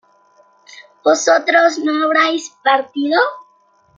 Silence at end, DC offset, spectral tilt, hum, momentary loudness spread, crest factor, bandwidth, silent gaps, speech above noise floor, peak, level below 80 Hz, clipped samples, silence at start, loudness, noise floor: 0.55 s; under 0.1%; -1 dB/octave; none; 6 LU; 16 dB; 9.2 kHz; none; 40 dB; -2 dBFS; -70 dBFS; under 0.1%; 0.75 s; -15 LUFS; -55 dBFS